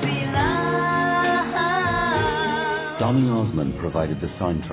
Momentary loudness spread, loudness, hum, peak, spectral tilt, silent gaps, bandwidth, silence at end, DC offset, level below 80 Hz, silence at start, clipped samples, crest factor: 5 LU; -22 LUFS; none; -8 dBFS; -10.5 dB/octave; none; 4 kHz; 0 s; under 0.1%; -40 dBFS; 0 s; under 0.1%; 14 dB